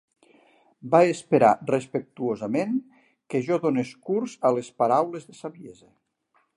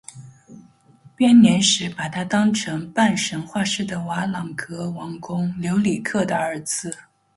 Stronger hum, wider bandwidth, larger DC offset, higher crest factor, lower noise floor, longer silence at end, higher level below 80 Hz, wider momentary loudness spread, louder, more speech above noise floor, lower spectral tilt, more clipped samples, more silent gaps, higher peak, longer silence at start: neither; about the same, 11.5 kHz vs 11.5 kHz; neither; about the same, 20 dB vs 18 dB; first, -69 dBFS vs -52 dBFS; first, 0.85 s vs 0.4 s; second, -72 dBFS vs -58 dBFS; about the same, 14 LU vs 15 LU; second, -24 LUFS vs -21 LUFS; first, 45 dB vs 31 dB; first, -6.5 dB/octave vs -4 dB/octave; neither; neither; about the same, -4 dBFS vs -4 dBFS; first, 0.85 s vs 0.15 s